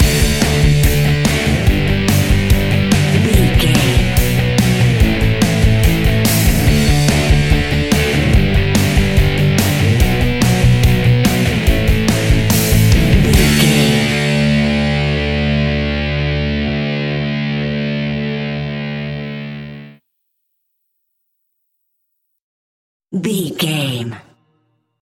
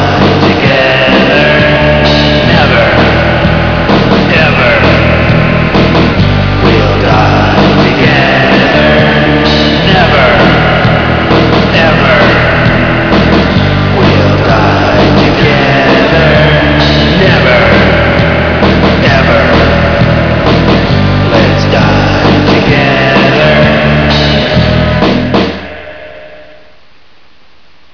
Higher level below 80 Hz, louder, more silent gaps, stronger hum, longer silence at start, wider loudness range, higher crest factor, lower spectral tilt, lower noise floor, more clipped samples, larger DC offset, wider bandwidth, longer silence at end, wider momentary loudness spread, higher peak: about the same, -20 dBFS vs -20 dBFS; second, -14 LUFS vs -6 LUFS; first, 22.41-23.00 s vs none; neither; about the same, 0 s vs 0 s; first, 11 LU vs 1 LU; first, 14 dB vs 6 dB; second, -5.5 dB/octave vs -7 dB/octave; first, -69 dBFS vs -44 dBFS; second, under 0.1% vs 2%; second, under 0.1% vs 2%; first, 17 kHz vs 5.4 kHz; second, 0.8 s vs 1.55 s; first, 8 LU vs 3 LU; about the same, 0 dBFS vs 0 dBFS